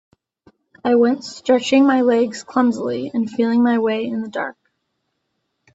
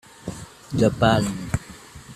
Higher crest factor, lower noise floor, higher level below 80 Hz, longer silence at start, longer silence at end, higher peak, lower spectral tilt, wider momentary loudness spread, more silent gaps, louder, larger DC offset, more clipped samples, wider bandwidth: second, 16 dB vs 22 dB; first, -73 dBFS vs -43 dBFS; second, -66 dBFS vs -44 dBFS; first, 0.85 s vs 0.25 s; first, 1.25 s vs 0 s; about the same, -2 dBFS vs -2 dBFS; about the same, -5 dB/octave vs -6 dB/octave; second, 10 LU vs 22 LU; neither; first, -18 LUFS vs -22 LUFS; neither; neither; second, 8 kHz vs 14.5 kHz